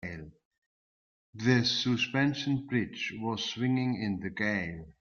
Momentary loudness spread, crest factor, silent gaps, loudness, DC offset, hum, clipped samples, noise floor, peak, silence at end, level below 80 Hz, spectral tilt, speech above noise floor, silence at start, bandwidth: 8 LU; 20 dB; 0.45-0.51 s, 0.58-1.33 s; -30 LUFS; under 0.1%; none; under 0.1%; under -90 dBFS; -10 dBFS; 0.1 s; -64 dBFS; -5 dB/octave; over 60 dB; 0 s; 7.2 kHz